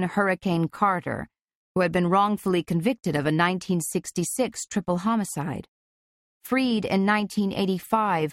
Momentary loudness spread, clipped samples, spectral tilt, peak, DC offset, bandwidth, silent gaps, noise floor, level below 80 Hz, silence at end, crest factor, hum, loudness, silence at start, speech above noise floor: 7 LU; under 0.1%; -5.5 dB/octave; -8 dBFS; under 0.1%; 16 kHz; 1.41-1.45 s, 1.55-1.75 s, 5.68-6.41 s; under -90 dBFS; -58 dBFS; 0 s; 18 dB; none; -25 LUFS; 0 s; over 66 dB